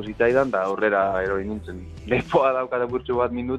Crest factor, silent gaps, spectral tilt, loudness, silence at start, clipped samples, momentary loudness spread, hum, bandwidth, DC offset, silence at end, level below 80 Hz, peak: 18 dB; none; -7 dB/octave; -23 LUFS; 0 s; under 0.1%; 11 LU; none; 9.2 kHz; under 0.1%; 0 s; -46 dBFS; -4 dBFS